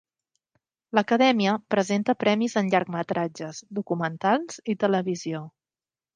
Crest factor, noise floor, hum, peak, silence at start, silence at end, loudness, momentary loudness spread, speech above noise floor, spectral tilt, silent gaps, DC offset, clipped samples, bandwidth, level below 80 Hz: 20 dB; under -90 dBFS; none; -6 dBFS; 0.95 s; 0.65 s; -25 LUFS; 12 LU; over 66 dB; -5.5 dB/octave; none; under 0.1%; under 0.1%; 9.6 kHz; -74 dBFS